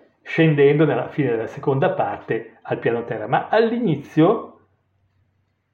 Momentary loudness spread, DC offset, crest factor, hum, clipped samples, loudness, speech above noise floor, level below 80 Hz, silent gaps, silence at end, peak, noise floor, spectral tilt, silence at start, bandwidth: 11 LU; under 0.1%; 16 dB; none; under 0.1%; -20 LUFS; 48 dB; -68 dBFS; none; 1.25 s; -4 dBFS; -67 dBFS; -9 dB/octave; 0.25 s; 6.8 kHz